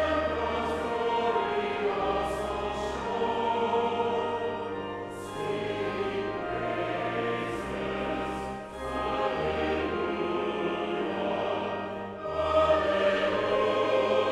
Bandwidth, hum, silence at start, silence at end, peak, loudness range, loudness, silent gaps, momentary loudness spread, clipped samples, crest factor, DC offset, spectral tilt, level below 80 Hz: 13 kHz; none; 0 s; 0 s; -12 dBFS; 4 LU; -29 LUFS; none; 9 LU; under 0.1%; 16 dB; under 0.1%; -5.5 dB/octave; -50 dBFS